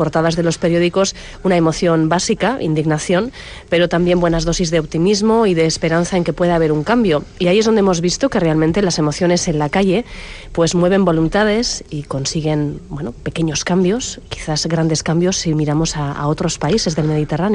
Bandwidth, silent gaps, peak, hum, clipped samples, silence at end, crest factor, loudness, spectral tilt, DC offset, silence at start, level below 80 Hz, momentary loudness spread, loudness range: 10.5 kHz; none; -2 dBFS; none; under 0.1%; 0 s; 12 dB; -16 LUFS; -5 dB/octave; under 0.1%; 0 s; -36 dBFS; 8 LU; 3 LU